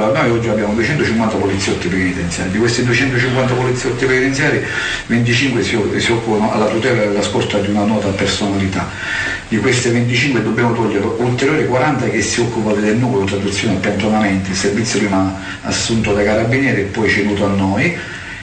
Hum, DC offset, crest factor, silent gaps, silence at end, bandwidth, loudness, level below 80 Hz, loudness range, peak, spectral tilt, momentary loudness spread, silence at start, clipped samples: none; under 0.1%; 10 dB; none; 0 s; 9.4 kHz; -15 LUFS; -38 dBFS; 1 LU; -4 dBFS; -5 dB/octave; 4 LU; 0 s; under 0.1%